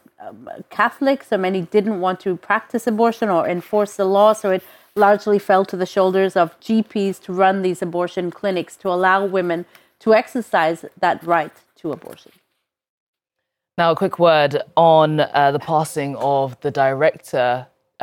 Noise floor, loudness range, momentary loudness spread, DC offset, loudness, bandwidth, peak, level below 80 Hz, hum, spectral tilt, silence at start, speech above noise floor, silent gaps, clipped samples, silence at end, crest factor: -81 dBFS; 4 LU; 10 LU; under 0.1%; -18 LUFS; 18 kHz; -2 dBFS; -68 dBFS; none; -6 dB/octave; 0.2 s; 62 dB; 12.89-13.13 s; under 0.1%; 0 s; 16 dB